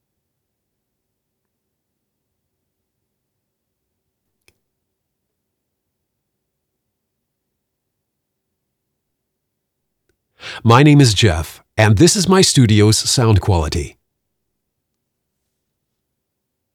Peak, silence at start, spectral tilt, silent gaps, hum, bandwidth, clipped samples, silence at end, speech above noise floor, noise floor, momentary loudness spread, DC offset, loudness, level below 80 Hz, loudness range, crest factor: 0 dBFS; 10.45 s; -5 dB/octave; none; none; 15.5 kHz; under 0.1%; 2.85 s; 64 dB; -76 dBFS; 15 LU; under 0.1%; -12 LUFS; -42 dBFS; 10 LU; 20 dB